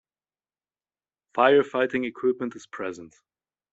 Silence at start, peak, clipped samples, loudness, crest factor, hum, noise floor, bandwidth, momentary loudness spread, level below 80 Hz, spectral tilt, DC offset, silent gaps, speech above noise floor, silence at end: 1.35 s; -4 dBFS; under 0.1%; -25 LUFS; 22 dB; none; under -90 dBFS; 7.8 kHz; 15 LU; -70 dBFS; -5.5 dB/octave; under 0.1%; none; over 66 dB; 0.65 s